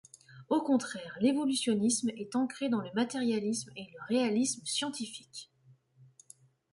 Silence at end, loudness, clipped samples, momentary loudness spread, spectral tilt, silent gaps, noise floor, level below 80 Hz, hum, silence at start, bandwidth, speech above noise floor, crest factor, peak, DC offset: 1.3 s; -32 LUFS; under 0.1%; 12 LU; -3.5 dB/octave; none; -63 dBFS; -76 dBFS; none; 0.3 s; 11.5 kHz; 32 dB; 16 dB; -16 dBFS; under 0.1%